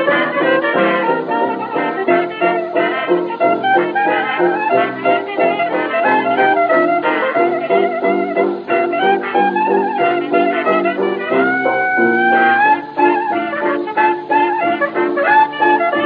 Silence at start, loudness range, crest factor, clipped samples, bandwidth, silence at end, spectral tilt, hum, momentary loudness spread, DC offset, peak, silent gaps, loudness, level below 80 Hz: 0 s; 2 LU; 14 dB; under 0.1%; 5 kHz; 0 s; -8 dB/octave; none; 5 LU; under 0.1%; 0 dBFS; none; -15 LUFS; -72 dBFS